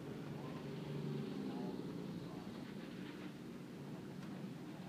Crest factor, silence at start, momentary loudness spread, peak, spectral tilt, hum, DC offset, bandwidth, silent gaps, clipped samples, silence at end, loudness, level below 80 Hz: 14 dB; 0 s; 6 LU; -32 dBFS; -7 dB/octave; none; under 0.1%; 15.5 kHz; none; under 0.1%; 0 s; -48 LUFS; -74 dBFS